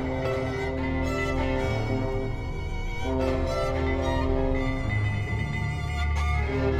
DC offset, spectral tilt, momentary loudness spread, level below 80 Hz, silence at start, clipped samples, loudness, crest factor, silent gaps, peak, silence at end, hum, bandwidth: under 0.1%; -7 dB/octave; 4 LU; -32 dBFS; 0 s; under 0.1%; -28 LUFS; 14 dB; none; -12 dBFS; 0 s; none; 10.5 kHz